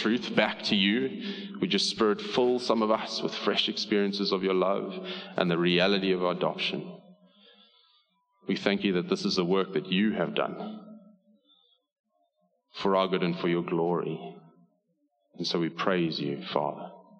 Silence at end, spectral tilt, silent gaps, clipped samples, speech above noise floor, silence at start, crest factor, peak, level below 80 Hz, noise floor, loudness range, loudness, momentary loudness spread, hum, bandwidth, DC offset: 0.2 s; -5 dB/octave; 11.92-12.04 s; under 0.1%; 47 dB; 0 s; 22 dB; -8 dBFS; -72 dBFS; -75 dBFS; 5 LU; -28 LUFS; 11 LU; none; 9.8 kHz; under 0.1%